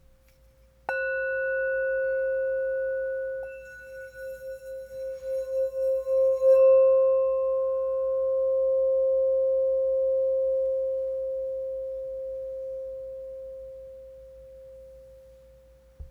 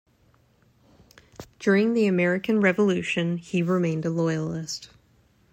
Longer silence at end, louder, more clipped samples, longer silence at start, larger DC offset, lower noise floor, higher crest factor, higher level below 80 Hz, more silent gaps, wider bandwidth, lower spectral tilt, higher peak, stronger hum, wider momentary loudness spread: second, 0 s vs 0.65 s; about the same, -26 LUFS vs -24 LUFS; neither; second, 0.9 s vs 1.4 s; neither; second, -58 dBFS vs -62 dBFS; about the same, 14 dB vs 18 dB; first, -58 dBFS vs -64 dBFS; neither; second, 4.3 kHz vs 14.5 kHz; second, -4.5 dB/octave vs -6.5 dB/octave; second, -12 dBFS vs -8 dBFS; neither; first, 19 LU vs 9 LU